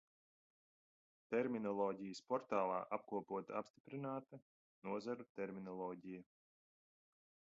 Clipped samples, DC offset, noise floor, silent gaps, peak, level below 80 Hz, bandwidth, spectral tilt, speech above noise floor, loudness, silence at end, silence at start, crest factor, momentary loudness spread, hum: under 0.1%; under 0.1%; under -90 dBFS; 3.70-3.74 s, 3.80-3.85 s, 4.42-4.82 s, 5.29-5.35 s; -26 dBFS; -88 dBFS; 7.2 kHz; -5.5 dB/octave; over 46 dB; -45 LUFS; 1.35 s; 1.3 s; 22 dB; 13 LU; none